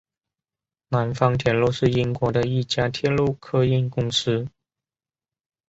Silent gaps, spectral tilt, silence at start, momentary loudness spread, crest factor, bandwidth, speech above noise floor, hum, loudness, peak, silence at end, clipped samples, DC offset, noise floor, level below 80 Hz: none; -6 dB/octave; 0.9 s; 5 LU; 20 dB; 8 kHz; over 69 dB; none; -22 LUFS; -4 dBFS; 1.2 s; under 0.1%; under 0.1%; under -90 dBFS; -50 dBFS